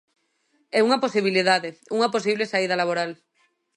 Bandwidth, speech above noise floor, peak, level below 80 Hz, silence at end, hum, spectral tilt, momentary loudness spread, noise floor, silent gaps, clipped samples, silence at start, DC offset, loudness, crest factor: 11 kHz; 46 dB; -6 dBFS; -78 dBFS; 0.6 s; none; -4 dB/octave; 7 LU; -68 dBFS; none; under 0.1%; 0.75 s; under 0.1%; -22 LUFS; 18 dB